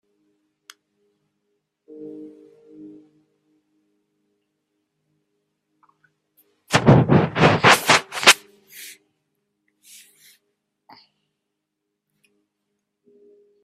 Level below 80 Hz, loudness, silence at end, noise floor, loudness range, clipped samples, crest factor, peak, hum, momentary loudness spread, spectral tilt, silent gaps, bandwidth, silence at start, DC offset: -54 dBFS; -15 LUFS; 4.75 s; -80 dBFS; 6 LU; under 0.1%; 24 dB; 0 dBFS; none; 26 LU; -4 dB/octave; none; 16 kHz; 2 s; under 0.1%